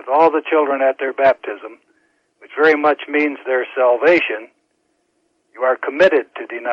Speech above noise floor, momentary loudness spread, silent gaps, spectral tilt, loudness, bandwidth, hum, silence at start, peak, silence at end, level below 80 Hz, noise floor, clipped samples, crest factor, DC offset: 50 dB; 15 LU; none; -5.5 dB/octave; -16 LUFS; 7.6 kHz; none; 0.05 s; -4 dBFS; 0 s; -64 dBFS; -66 dBFS; under 0.1%; 14 dB; under 0.1%